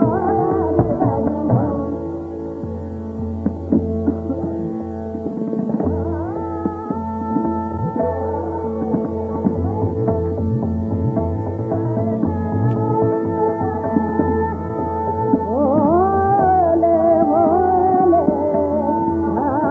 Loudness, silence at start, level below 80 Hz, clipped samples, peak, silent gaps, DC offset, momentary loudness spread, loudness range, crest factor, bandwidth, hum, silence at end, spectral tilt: -19 LUFS; 0 s; -44 dBFS; under 0.1%; -2 dBFS; none; under 0.1%; 10 LU; 8 LU; 18 dB; 3.5 kHz; none; 0 s; -11 dB/octave